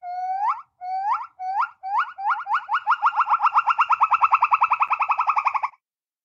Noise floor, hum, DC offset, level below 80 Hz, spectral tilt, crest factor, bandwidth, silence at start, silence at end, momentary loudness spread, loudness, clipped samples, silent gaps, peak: -67 dBFS; none; under 0.1%; -76 dBFS; 0 dB/octave; 18 dB; 7.6 kHz; 0.05 s; 0.55 s; 10 LU; -22 LUFS; under 0.1%; none; -6 dBFS